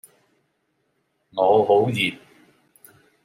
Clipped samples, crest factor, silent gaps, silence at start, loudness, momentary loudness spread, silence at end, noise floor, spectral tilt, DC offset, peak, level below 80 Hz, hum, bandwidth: under 0.1%; 18 dB; none; 1.35 s; -19 LUFS; 8 LU; 1.1 s; -71 dBFS; -5.5 dB/octave; under 0.1%; -6 dBFS; -70 dBFS; none; 15.5 kHz